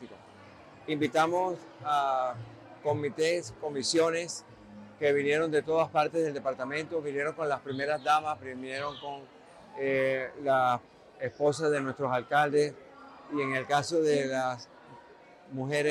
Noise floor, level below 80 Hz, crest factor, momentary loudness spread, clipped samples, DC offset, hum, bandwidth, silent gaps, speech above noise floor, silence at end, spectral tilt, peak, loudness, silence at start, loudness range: -54 dBFS; -72 dBFS; 16 dB; 15 LU; under 0.1%; under 0.1%; none; 13.5 kHz; none; 25 dB; 0 s; -4.5 dB/octave; -14 dBFS; -30 LUFS; 0 s; 3 LU